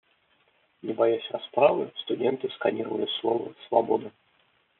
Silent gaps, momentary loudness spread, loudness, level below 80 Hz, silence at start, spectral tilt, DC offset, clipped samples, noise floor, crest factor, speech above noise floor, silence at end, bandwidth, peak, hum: none; 9 LU; -27 LUFS; -78 dBFS; 0.85 s; -3 dB/octave; under 0.1%; under 0.1%; -67 dBFS; 22 dB; 41 dB; 0.7 s; 4.2 kHz; -4 dBFS; none